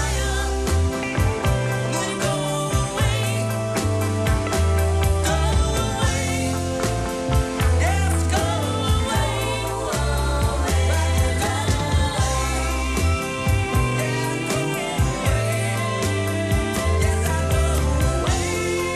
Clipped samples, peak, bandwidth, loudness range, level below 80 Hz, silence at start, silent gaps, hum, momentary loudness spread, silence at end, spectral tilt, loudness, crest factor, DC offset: under 0.1%; -8 dBFS; 13 kHz; 1 LU; -26 dBFS; 0 s; none; none; 3 LU; 0 s; -5 dB/octave; -22 LUFS; 12 dB; under 0.1%